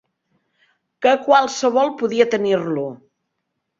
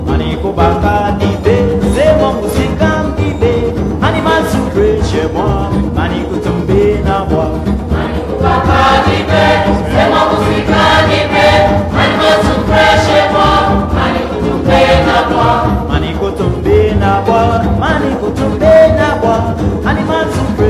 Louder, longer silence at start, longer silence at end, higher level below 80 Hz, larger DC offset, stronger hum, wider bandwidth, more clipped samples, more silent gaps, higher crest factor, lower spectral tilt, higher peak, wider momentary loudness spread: second, -18 LUFS vs -11 LUFS; first, 1 s vs 0 s; first, 0.85 s vs 0 s; second, -68 dBFS vs -22 dBFS; neither; neither; second, 7.8 kHz vs 14.5 kHz; neither; neither; first, 18 dB vs 10 dB; second, -4.5 dB/octave vs -6.5 dB/octave; about the same, -2 dBFS vs 0 dBFS; about the same, 9 LU vs 7 LU